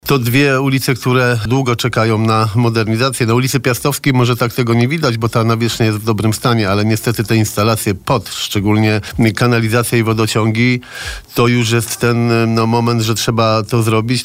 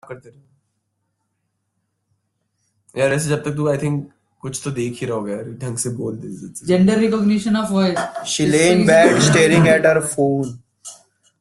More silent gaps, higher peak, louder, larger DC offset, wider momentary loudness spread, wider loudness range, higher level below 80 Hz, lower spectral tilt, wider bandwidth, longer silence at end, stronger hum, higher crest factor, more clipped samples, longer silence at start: neither; about the same, -2 dBFS vs -2 dBFS; first, -14 LUFS vs -17 LUFS; neither; second, 3 LU vs 19 LU; second, 1 LU vs 10 LU; first, -42 dBFS vs -54 dBFS; about the same, -5.5 dB/octave vs -5 dB/octave; first, 16.5 kHz vs 12.5 kHz; second, 0 s vs 0.45 s; neither; second, 12 dB vs 18 dB; neither; about the same, 0.05 s vs 0.1 s